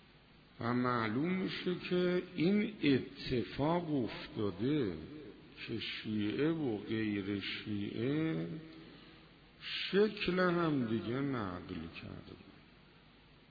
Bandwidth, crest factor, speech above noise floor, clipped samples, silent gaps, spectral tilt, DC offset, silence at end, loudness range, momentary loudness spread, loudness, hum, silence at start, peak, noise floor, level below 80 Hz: 5 kHz; 18 dB; 26 dB; under 0.1%; none; -5 dB/octave; under 0.1%; 0.9 s; 3 LU; 16 LU; -36 LUFS; none; 0.6 s; -20 dBFS; -62 dBFS; -64 dBFS